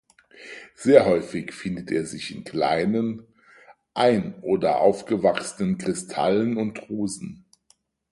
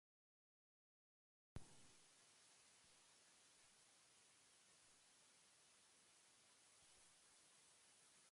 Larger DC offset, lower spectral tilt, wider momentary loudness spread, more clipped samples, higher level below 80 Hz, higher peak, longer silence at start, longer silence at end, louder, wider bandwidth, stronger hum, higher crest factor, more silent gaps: neither; first, -5.5 dB/octave vs -2.5 dB/octave; first, 16 LU vs 6 LU; neither; first, -58 dBFS vs -80 dBFS; first, -2 dBFS vs -42 dBFS; second, 0.4 s vs 1.55 s; first, 0.75 s vs 0 s; first, -23 LUFS vs -68 LUFS; about the same, 11.5 kHz vs 11.5 kHz; neither; second, 22 dB vs 30 dB; neither